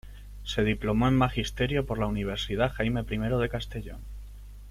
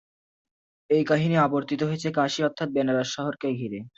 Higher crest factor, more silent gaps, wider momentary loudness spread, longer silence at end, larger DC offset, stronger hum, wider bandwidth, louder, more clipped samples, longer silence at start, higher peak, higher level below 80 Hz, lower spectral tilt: about the same, 18 dB vs 18 dB; neither; first, 20 LU vs 7 LU; about the same, 0 s vs 0.1 s; neither; first, 50 Hz at -40 dBFS vs none; first, 15.5 kHz vs 8 kHz; second, -28 LUFS vs -25 LUFS; neither; second, 0.05 s vs 0.9 s; about the same, -10 dBFS vs -8 dBFS; first, -40 dBFS vs -66 dBFS; about the same, -6.5 dB/octave vs -6 dB/octave